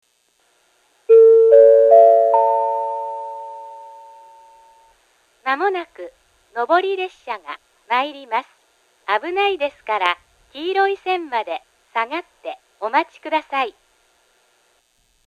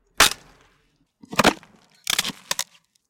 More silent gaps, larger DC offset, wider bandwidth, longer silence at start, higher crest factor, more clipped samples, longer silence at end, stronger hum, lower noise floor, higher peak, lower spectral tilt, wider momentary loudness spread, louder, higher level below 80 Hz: neither; neither; second, 6.8 kHz vs 17 kHz; first, 1.1 s vs 0.2 s; second, 18 dB vs 24 dB; neither; first, 1.55 s vs 0.45 s; neither; about the same, -63 dBFS vs -65 dBFS; about the same, 0 dBFS vs -2 dBFS; first, -3 dB/octave vs -1.5 dB/octave; first, 24 LU vs 17 LU; first, -17 LUFS vs -21 LUFS; second, -70 dBFS vs -50 dBFS